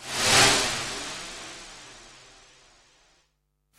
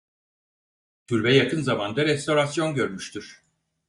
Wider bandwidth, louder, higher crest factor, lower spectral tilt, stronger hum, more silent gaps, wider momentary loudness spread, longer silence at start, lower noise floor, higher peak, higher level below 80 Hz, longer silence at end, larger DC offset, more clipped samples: first, 16 kHz vs 11.5 kHz; about the same, -21 LUFS vs -23 LUFS; about the same, 22 dB vs 20 dB; second, -1 dB/octave vs -5 dB/octave; neither; neither; first, 26 LU vs 13 LU; second, 0 s vs 1.1 s; second, -73 dBFS vs under -90 dBFS; about the same, -6 dBFS vs -6 dBFS; first, -52 dBFS vs -62 dBFS; first, 1.7 s vs 0.55 s; neither; neither